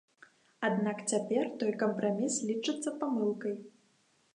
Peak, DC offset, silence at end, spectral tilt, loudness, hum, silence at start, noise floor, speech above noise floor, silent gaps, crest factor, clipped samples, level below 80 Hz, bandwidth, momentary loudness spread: -16 dBFS; under 0.1%; 0.65 s; -4.5 dB/octave; -33 LUFS; none; 0.6 s; -70 dBFS; 38 dB; none; 18 dB; under 0.1%; -86 dBFS; 11 kHz; 4 LU